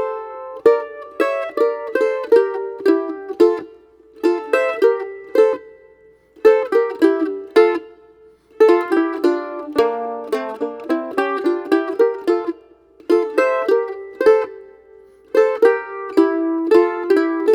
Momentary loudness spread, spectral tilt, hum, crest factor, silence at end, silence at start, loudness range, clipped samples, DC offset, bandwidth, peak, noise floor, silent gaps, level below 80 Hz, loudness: 10 LU; -4.5 dB/octave; none; 16 dB; 0 s; 0 s; 3 LU; under 0.1%; under 0.1%; 13 kHz; 0 dBFS; -50 dBFS; none; -64 dBFS; -18 LUFS